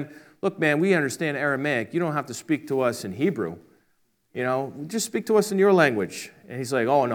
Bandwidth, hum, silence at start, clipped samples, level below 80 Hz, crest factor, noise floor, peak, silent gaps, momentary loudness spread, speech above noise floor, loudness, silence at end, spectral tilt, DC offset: 19 kHz; none; 0 s; under 0.1%; -76 dBFS; 20 dB; -68 dBFS; -4 dBFS; none; 13 LU; 44 dB; -24 LUFS; 0 s; -5 dB/octave; under 0.1%